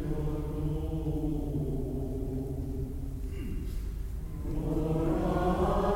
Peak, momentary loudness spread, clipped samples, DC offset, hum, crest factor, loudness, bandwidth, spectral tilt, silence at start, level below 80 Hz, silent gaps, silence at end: -14 dBFS; 10 LU; under 0.1%; under 0.1%; none; 16 dB; -33 LUFS; 16 kHz; -8.5 dB/octave; 0 s; -36 dBFS; none; 0 s